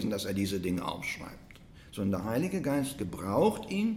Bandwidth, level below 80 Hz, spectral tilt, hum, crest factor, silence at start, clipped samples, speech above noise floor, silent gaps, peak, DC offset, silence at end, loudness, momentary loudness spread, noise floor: 16.5 kHz; -56 dBFS; -6 dB/octave; none; 18 dB; 0 s; under 0.1%; 21 dB; none; -14 dBFS; under 0.1%; 0 s; -32 LUFS; 12 LU; -52 dBFS